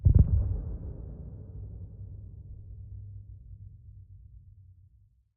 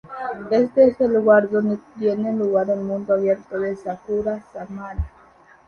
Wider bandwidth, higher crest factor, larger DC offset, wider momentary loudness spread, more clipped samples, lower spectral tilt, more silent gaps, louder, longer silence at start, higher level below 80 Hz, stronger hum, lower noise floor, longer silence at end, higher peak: second, 1.4 kHz vs 6.6 kHz; about the same, 22 dB vs 18 dB; neither; first, 25 LU vs 15 LU; neither; first, -16 dB/octave vs -8.5 dB/octave; neither; second, -32 LUFS vs -20 LUFS; about the same, 0 s vs 0.05 s; first, -36 dBFS vs -42 dBFS; neither; first, -62 dBFS vs -51 dBFS; first, 1 s vs 0.6 s; second, -8 dBFS vs -2 dBFS